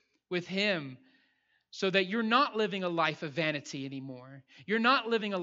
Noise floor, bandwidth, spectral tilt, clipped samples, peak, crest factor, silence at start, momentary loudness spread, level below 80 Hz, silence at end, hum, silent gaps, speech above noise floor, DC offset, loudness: -73 dBFS; 7.8 kHz; -5 dB/octave; under 0.1%; -10 dBFS; 22 dB; 0.3 s; 18 LU; -86 dBFS; 0 s; none; none; 42 dB; under 0.1%; -30 LUFS